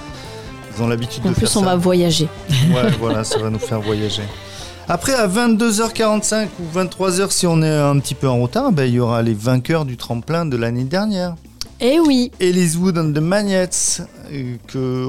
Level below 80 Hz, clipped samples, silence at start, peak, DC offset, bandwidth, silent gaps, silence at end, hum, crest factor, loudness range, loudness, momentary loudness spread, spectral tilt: -42 dBFS; under 0.1%; 0 s; -6 dBFS; 0.9%; 16.5 kHz; none; 0 s; none; 12 dB; 2 LU; -17 LUFS; 12 LU; -5 dB/octave